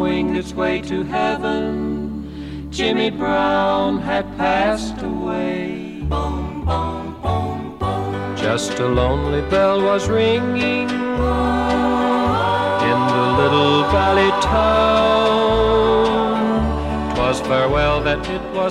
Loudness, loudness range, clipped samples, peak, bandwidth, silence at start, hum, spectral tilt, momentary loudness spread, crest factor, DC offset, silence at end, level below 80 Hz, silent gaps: -18 LUFS; 7 LU; under 0.1%; -2 dBFS; 13 kHz; 0 s; none; -6 dB/octave; 9 LU; 16 dB; 0.2%; 0 s; -32 dBFS; none